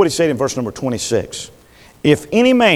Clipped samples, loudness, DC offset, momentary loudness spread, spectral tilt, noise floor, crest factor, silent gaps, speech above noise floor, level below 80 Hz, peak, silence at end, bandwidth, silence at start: under 0.1%; -17 LUFS; under 0.1%; 14 LU; -4.5 dB/octave; -46 dBFS; 16 dB; none; 30 dB; -48 dBFS; 0 dBFS; 0 s; 15.5 kHz; 0 s